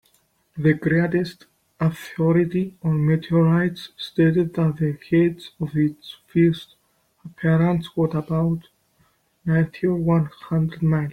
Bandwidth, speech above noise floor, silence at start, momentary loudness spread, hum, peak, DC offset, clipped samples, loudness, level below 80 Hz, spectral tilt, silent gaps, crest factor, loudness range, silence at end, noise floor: 6.2 kHz; 43 dB; 0.55 s; 8 LU; none; -6 dBFS; under 0.1%; under 0.1%; -22 LUFS; -52 dBFS; -8.5 dB/octave; none; 16 dB; 3 LU; 0 s; -63 dBFS